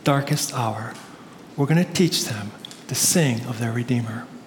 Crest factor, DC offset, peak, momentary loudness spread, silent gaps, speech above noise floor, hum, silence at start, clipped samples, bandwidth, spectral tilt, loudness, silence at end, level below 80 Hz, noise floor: 18 dB; under 0.1%; -6 dBFS; 19 LU; none; 20 dB; none; 0 s; under 0.1%; 19 kHz; -4.5 dB/octave; -22 LUFS; 0 s; -64 dBFS; -43 dBFS